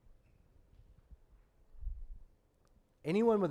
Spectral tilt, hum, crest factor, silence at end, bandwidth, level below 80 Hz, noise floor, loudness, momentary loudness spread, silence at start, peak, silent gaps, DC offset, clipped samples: -8 dB/octave; none; 20 dB; 0 s; 11.5 kHz; -52 dBFS; -69 dBFS; -34 LUFS; 23 LU; 1.1 s; -20 dBFS; none; under 0.1%; under 0.1%